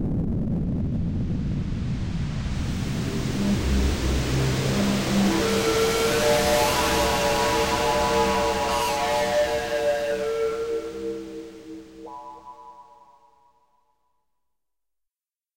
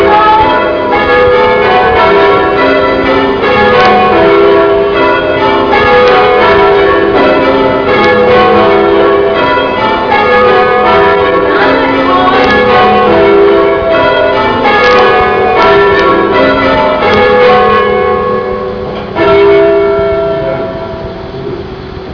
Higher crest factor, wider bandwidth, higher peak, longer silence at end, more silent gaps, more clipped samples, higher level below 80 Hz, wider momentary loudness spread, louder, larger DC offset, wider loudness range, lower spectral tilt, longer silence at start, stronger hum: first, 14 dB vs 6 dB; first, 16 kHz vs 5.4 kHz; second, -10 dBFS vs 0 dBFS; first, 2.75 s vs 0 s; neither; neither; about the same, -34 dBFS vs -30 dBFS; first, 16 LU vs 7 LU; second, -24 LUFS vs -6 LUFS; second, under 0.1% vs 0.4%; first, 11 LU vs 2 LU; second, -4.5 dB/octave vs -6.5 dB/octave; about the same, 0 s vs 0 s; neither